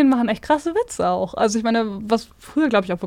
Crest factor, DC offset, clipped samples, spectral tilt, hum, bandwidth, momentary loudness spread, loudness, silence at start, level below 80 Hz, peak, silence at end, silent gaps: 14 dB; under 0.1%; under 0.1%; -5 dB/octave; none; 14.5 kHz; 5 LU; -21 LUFS; 0 s; -50 dBFS; -4 dBFS; 0 s; none